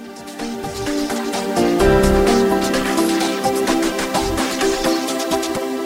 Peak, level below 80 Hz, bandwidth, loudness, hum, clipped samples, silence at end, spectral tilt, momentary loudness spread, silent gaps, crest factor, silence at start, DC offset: -2 dBFS; -32 dBFS; 16 kHz; -18 LUFS; none; under 0.1%; 0 s; -4 dB/octave; 10 LU; none; 16 dB; 0 s; under 0.1%